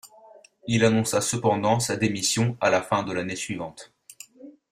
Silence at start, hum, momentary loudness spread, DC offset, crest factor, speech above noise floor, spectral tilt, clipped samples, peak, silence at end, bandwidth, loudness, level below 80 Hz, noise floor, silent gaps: 0.05 s; none; 21 LU; under 0.1%; 20 dB; 28 dB; -4.5 dB/octave; under 0.1%; -6 dBFS; 0.2 s; 16 kHz; -24 LUFS; -60 dBFS; -52 dBFS; none